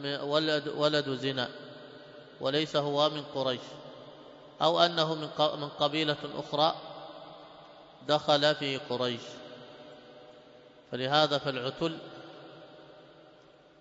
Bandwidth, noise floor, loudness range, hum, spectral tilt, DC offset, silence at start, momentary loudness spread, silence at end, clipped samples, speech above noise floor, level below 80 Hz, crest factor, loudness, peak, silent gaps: 7.8 kHz; -58 dBFS; 4 LU; none; -5 dB/octave; under 0.1%; 0 s; 24 LU; 0.75 s; under 0.1%; 28 dB; -74 dBFS; 24 dB; -29 LUFS; -8 dBFS; none